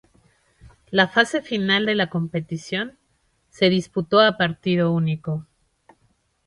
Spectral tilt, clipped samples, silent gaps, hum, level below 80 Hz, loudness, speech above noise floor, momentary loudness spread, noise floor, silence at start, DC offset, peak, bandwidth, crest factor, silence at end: -6 dB/octave; under 0.1%; none; none; -60 dBFS; -21 LUFS; 46 dB; 11 LU; -67 dBFS; 0.65 s; under 0.1%; -2 dBFS; 11 kHz; 20 dB; 1.05 s